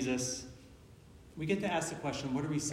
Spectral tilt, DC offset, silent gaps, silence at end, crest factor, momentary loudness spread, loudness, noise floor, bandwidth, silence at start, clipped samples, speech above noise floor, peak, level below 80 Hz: -4.5 dB/octave; under 0.1%; none; 0 s; 18 dB; 20 LU; -36 LUFS; -56 dBFS; 16 kHz; 0 s; under 0.1%; 21 dB; -20 dBFS; -62 dBFS